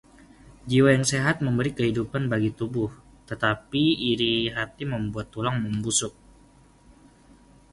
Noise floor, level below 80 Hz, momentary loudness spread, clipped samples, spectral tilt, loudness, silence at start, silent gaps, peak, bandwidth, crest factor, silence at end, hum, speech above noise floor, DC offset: -55 dBFS; -52 dBFS; 10 LU; under 0.1%; -4.5 dB/octave; -25 LUFS; 0.65 s; none; -6 dBFS; 11.5 kHz; 20 dB; 1.6 s; none; 30 dB; under 0.1%